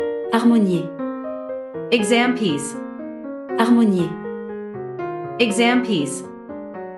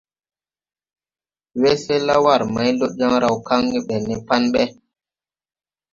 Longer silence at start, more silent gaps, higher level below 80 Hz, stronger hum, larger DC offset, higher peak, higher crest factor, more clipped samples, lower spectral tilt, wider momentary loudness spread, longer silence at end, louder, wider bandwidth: second, 0 s vs 1.55 s; neither; second, -66 dBFS vs -54 dBFS; neither; neither; about the same, -2 dBFS vs 0 dBFS; about the same, 20 dB vs 20 dB; neither; about the same, -5 dB/octave vs -5 dB/octave; first, 16 LU vs 8 LU; second, 0 s vs 1.2 s; about the same, -20 LUFS vs -18 LUFS; first, 12 kHz vs 7.6 kHz